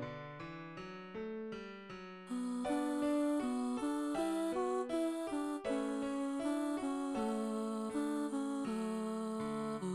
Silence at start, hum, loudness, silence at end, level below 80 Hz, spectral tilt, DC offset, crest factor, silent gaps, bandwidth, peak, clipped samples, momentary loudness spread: 0 s; none; -39 LUFS; 0 s; -70 dBFS; -5.5 dB/octave; under 0.1%; 12 dB; none; 13.5 kHz; -26 dBFS; under 0.1%; 12 LU